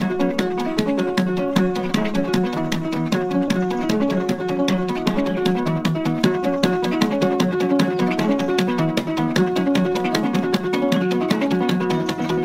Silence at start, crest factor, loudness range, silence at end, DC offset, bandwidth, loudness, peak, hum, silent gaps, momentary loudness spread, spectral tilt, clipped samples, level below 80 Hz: 0 s; 18 dB; 2 LU; 0 s; under 0.1%; 16 kHz; -20 LUFS; -2 dBFS; none; none; 3 LU; -6 dB/octave; under 0.1%; -50 dBFS